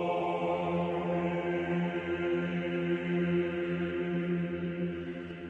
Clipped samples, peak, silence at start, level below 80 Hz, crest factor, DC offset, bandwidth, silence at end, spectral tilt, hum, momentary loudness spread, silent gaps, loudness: under 0.1%; -20 dBFS; 0 s; -62 dBFS; 12 dB; under 0.1%; 4.2 kHz; 0 s; -8.5 dB/octave; none; 4 LU; none; -32 LUFS